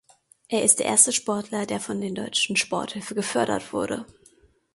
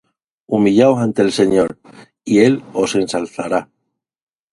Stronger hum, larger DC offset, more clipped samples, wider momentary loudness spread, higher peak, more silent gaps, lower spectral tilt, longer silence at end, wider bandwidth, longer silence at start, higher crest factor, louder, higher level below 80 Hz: neither; neither; neither; about the same, 12 LU vs 10 LU; about the same, -2 dBFS vs 0 dBFS; neither; second, -2 dB/octave vs -6 dB/octave; second, 0.7 s vs 0.9 s; about the same, 12 kHz vs 11.5 kHz; about the same, 0.5 s vs 0.5 s; first, 24 dB vs 16 dB; second, -23 LUFS vs -16 LUFS; second, -64 dBFS vs -54 dBFS